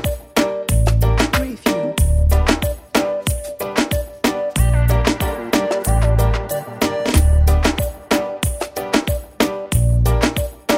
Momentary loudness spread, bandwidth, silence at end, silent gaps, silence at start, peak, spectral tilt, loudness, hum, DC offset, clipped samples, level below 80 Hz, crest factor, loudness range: 7 LU; 16.5 kHz; 0 s; none; 0 s; 0 dBFS; -5.5 dB/octave; -18 LUFS; none; under 0.1%; under 0.1%; -20 dBFS; 16 dB; 2 LU